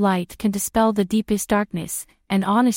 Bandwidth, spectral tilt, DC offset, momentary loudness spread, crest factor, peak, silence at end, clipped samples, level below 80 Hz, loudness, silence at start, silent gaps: 16.5 kHz; -5 dB/octave; under 0.1%; 8 LU; 14 dB; -6 dBFS; 0 s; under 0.1%; -48 dBFS; -22 LUFS; 0 s; none